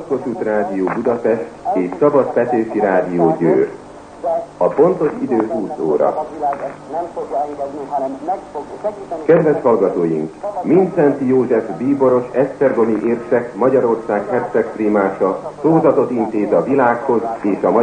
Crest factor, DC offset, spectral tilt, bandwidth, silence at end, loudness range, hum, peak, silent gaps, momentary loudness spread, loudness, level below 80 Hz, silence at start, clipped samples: 14 dB; under 0.1%; -8.5 dB/octave; 9.6 kHz; 0 s; 4 LU; none; -2 dBFS; none; 10 LU; -17 LUFS; -54 dBFS; 0 s; under 0.1%